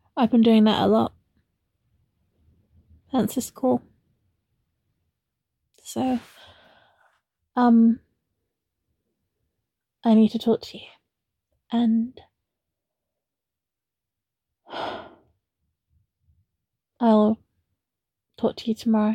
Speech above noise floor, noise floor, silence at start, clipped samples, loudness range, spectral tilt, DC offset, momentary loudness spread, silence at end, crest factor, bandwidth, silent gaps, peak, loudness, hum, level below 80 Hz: 68 dB; -88 dBFS; 0.15 s; under 0.1%; 18 LU; -6.5 dB/octave; under 0.1%; 16 LU; 0 s; 18 dB; 13.5 kHz; none; -8 dBFS; -22 LUFS; none; -64 dBFS